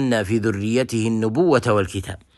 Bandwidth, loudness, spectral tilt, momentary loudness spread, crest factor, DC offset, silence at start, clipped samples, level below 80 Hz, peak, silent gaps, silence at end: 12.5 kHz; -20 LUFS; -6 dB/octave; 5 LU; 16 dB; under 0.1%; 0 s; under 0.1%; -50 dBFS; -4 dBFS; none; 0.2 s